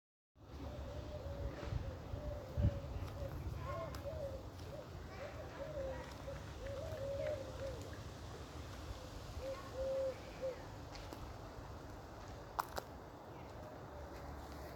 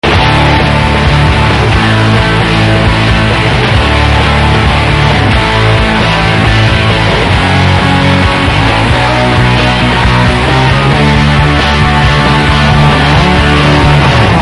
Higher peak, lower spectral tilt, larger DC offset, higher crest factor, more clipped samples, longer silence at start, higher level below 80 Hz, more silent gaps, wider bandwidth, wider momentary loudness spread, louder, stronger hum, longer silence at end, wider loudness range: second, -18 dBFS vs 0 dBFS; about the same, -6 dB/octave vs -6 dB/octave; neither; first, 28 dB vs 6 dB; second, under 0.1% vs 1%; first, 0.35 s vs 0.05 s; second, -52 dBFS vs -16 dBFS; neither; first, 19 kHz vs 11.5 kHz; first, 10 LU vs 2 LU; second, -47 LUFS vs -7 LUFS; neither; about the same, 0 s vs 0 s; first, 5 LU vs 1 LU